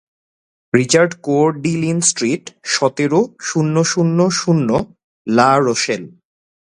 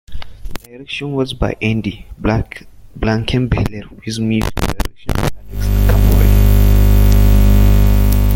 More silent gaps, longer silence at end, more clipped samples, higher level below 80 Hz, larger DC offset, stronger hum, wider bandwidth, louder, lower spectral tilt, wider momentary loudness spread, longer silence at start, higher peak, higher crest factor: first, 5.04-5.25 s vs none; first, 0.65 s vs 0 s; neither; second, -54 dBFS vs -14 dBFS; neither; neither; second, 11 kHz vs 17 kHz; about the same, -16 LUFS vs -15 LUFS; second, -4.5 dB/octave vs -6.5 dB/octave; second, 8 LU vs 17 LU; first, 0.75 s vs 0.1 s; about the same, 0 dBFS vs 0 dBFS; about the same, 16 dB vs 12 dB